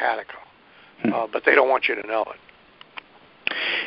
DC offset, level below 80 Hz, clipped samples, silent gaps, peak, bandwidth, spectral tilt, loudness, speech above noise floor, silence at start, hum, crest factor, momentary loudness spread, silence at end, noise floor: under 0.1%; -68 dBFS; under 0.1%; none; 0 dBFS; 5.8 kHz; -8 dB/octave; -22 LUFS; 30 dB; 0 s; none; 24 dB; 24 LU; 0 s; -52 dBFS